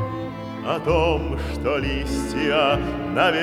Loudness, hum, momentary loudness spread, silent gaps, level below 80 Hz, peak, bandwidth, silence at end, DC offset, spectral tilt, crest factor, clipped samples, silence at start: -23 LUFS; none; 9 LU; none; -34 dBFS; -4 dBFS; 15 kHz; 0 s; under 0.1%; -5.5 dB/octave; 18 dB; under 0.1%; 0 s